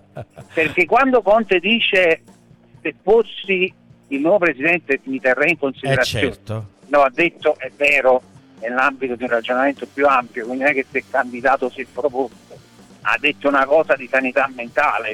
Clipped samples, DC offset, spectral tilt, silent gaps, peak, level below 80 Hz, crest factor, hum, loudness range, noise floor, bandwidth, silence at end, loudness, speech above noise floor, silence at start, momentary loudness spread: under 0.1%; under 0.1%; -5 dB/octave; none; -4 dBFS; -52 dBFS; 14 dB; none; 3 LU; -48 dBFS; 14.5 kHz; 0 s; -18 LUFS; 31 dB; 0.15 s; 11 LU